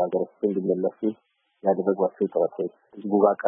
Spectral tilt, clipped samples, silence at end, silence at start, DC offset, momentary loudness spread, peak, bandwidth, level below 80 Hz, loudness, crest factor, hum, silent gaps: -12.5 dB/octave; under 0.1%; 0 s; 0 s; under 0.1%; 11 LU; -6 dBFS; 3.5 kHz; -78 dBFS; -25 LUFS; 20 dB; none; none